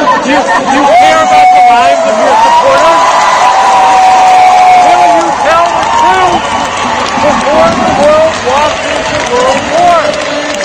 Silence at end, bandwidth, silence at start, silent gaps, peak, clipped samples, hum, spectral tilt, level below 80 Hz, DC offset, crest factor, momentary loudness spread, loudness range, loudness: 0 s; 11.5 kHz; 0 s; none; 0 dBFS; 3%; none; -3 dB/octave; -38 dBFS; under 0.1%; 6 dB; 7 LU; 3 LU; -6 LUFS